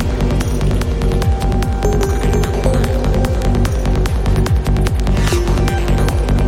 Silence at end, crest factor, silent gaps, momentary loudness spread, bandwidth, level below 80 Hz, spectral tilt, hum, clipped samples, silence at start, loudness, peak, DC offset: 0 s; 12 dB; none; 2 LU; 16 kHz; -16 dBFS; -6.5 dB/octave; none; under 0.1%; 0 s; -16 LUFS; -2 dBFS; under 0.1%